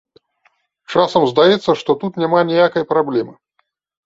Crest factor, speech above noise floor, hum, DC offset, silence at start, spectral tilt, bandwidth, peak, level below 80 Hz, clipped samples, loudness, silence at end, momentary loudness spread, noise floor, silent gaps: 16 dB; 52 dB; none; under 0.1%; 0.9 s; -6 dB/octave; 7.8 kHz; 0 dBFS; -60 dBFS; under 0.1%; -15 LUFS; 0.75 s; 8 LU; -67 dBFS; none